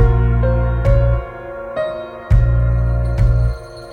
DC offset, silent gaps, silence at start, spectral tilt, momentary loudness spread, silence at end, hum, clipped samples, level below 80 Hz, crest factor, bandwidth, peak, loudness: under 0.1%; none; 0 s; -9.5 dB/octave; 12 LU; 0 s; none; under 0.1%; -18 dBFS; 14 dB; 4.6 kHz; -2 dBFS; -17 LUFS